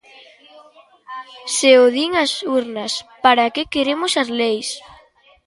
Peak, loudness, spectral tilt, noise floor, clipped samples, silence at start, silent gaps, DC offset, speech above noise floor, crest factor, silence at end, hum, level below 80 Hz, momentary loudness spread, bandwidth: 0 dBFS; -17 LUFS; -1.5 dB/octave; -51 dBFS; under 0.1%; 1.1 s; none; under 0.1%; 34 dB; 18 dB; 0.65 s; none; -58 dBFS; 19 LU; 11.5 kHz